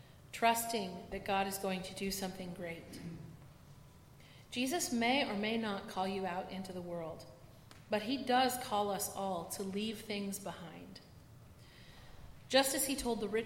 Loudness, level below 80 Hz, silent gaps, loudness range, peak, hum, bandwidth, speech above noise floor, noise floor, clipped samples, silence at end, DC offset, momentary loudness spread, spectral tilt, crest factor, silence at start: -36 LUFS; -64 dBFS; none; 5 LU; -14 dBFS; none; 16.5 kHz; 22 dB; -58 dBFS; under 0.1%; 0 s; under 0.1%; 24 LU; -3.5 dB/octave; 24 dB; 0 s